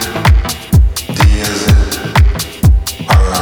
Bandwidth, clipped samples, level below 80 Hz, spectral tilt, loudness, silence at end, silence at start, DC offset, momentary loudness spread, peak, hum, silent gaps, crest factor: over 20 kHz; under 0.1%; -12 dBFS; -5 dB/octave; -12 LUFS; 0 s; 0 s; 0.1%; 3 LU; 0 dBFS; none; none; 10 dB